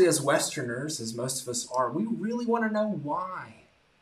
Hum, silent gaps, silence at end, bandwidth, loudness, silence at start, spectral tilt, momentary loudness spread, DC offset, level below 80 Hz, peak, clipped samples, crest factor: none; none; 0.5 s; 15 kHz; -29 LUFS; 0 s; -4 dB/octave; 7 LU; under 0.1%; -72 dBFS; -10 dBFS; under 0.1%; 18 dB